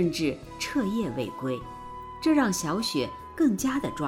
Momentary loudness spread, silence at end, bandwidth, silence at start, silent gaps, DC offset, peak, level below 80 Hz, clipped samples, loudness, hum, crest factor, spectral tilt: 11 LU; 0 s; 17 kHz; 0 s; none; under 0.1%; -12 dBFS; -52 dBFS; under 0.1%; -28 LUFS; none; 16 dB; -4.5 dB/octave